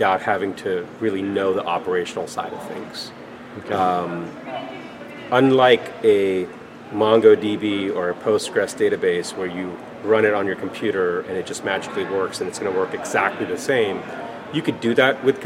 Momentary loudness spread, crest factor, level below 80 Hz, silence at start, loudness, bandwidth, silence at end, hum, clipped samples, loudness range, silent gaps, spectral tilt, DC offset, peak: 15 LU; 20 dB; -66 dBFS; 0 s; -21 LUFS; 14 kHz; 0 s; none; under 0.1%; 7 LU; none; -5 dB/octave; under 0.1%; -2 dBFS